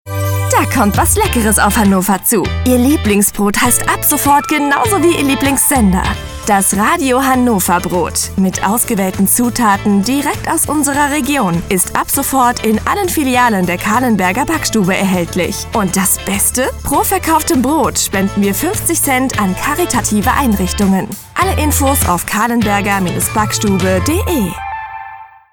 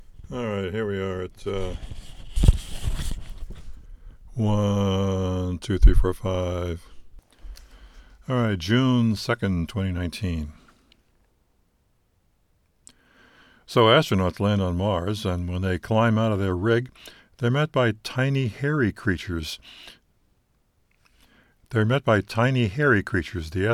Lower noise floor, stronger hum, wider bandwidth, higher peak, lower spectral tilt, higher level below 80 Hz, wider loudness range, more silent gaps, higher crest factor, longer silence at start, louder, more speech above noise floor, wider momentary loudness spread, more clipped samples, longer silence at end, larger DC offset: second, -33 dBFS vs -66 dBFS; neither; first, over 20 kHz vs 14.5 kHz; about the same, 0 dBFS vs -2 dBFS; second, -4 dB/octave vs -6.5 dB/octave; about the same, -28 dBFS vs -32 dBFS; second, 2 LU vs 6 LU; neither; second, 12 dB vs 24 dB; about the same, 0.05 s vs 0 s; first, -12 LUFS vs -24 LUFS; second, 20 dB vs 44 dB; second, 4 LU vs 16 LU; neither; first, 0.25 s vs 0 s; neither